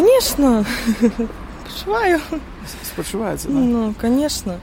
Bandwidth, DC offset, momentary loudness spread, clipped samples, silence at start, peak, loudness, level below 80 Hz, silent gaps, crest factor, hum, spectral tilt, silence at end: 16.5 kHz; under 0.1%; 13 LU; under 0.1%; 0 s; -2 dBFS; -19 LUFS; -36 dBFS; none; 16 dB; none; -4.5 dB/octave; 0 s